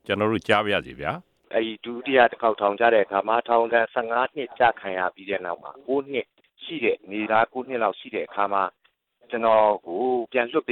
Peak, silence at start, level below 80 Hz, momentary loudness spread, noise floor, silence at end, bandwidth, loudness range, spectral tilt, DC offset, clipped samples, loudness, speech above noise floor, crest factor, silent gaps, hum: -4 dBFS; 0.1 s; -62 dBFS; 12 LU; -63 dBFS; 0 s; 10 kHz; 5 LU; -6 dB/octave; under 0.1%; under 0.1%; -24 LUFS; 39 dB; 20 dB; none; none